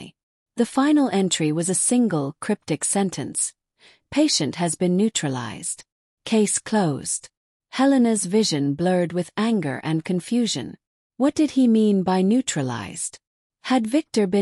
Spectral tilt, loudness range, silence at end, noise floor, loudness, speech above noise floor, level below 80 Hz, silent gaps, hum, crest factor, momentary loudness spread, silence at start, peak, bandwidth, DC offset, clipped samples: -4.5 dB/octave; 2 LU; 0 s; -57 dBFS; -22 LUFS; 36 dB; -64 dBFS; 0.23-0.46 s, 5.92-6.17 s, 7.37-7.60 s, 10.87-11.10 s, 13.27-13.50 s; none; 14 dB; 10 LU; 0 s; -8 dBFS; 13.5 kHz; under 0.1%; under 0.1%